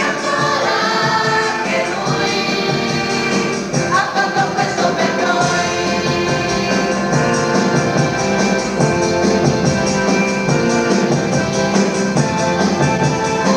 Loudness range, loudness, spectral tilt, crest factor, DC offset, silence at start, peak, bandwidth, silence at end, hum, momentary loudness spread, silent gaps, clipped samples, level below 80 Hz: 1 LU; -16 LUFS; -4.5 dB/octave; 14 dB; under 0.1%; 0 s; -2 dBFS; 14 kHz; 0 s; none; 2 LU; none; under 0.1%; -46 dBFS